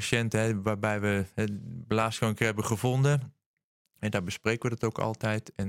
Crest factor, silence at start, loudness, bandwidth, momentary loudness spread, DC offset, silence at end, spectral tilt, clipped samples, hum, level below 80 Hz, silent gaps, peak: 20 dB; 0 s; -29 LUFS; 16 kHz; 6 LU; under 0.1%; 0 s; -5.5 dB/octave; under 0.1%; none; -60 dBFS; 3.46-3.57 s, 3.64-3.85 s; -10 dBFS